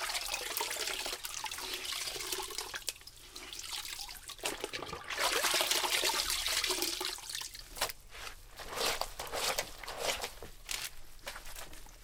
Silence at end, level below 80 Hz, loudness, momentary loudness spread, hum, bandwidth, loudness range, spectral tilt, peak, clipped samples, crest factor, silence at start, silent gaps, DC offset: 0 s; -56 dBFS; -35 LUFS; 17 LU; none; 18 kHz; 7 LU; 0 dB/octave; -10 dBFS; under 0.1%; 28 dB; 0 s; none; under 0.1%